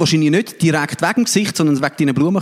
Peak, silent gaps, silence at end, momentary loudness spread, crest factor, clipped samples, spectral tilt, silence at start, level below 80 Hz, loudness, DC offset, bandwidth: -2 dBFS; none; 0 s; 2 LU; 14 dB; under 0.1%; -5 dB/octave; 0 s; -58 dBFS; -16 LUFS; under 0.1%; 16 kHz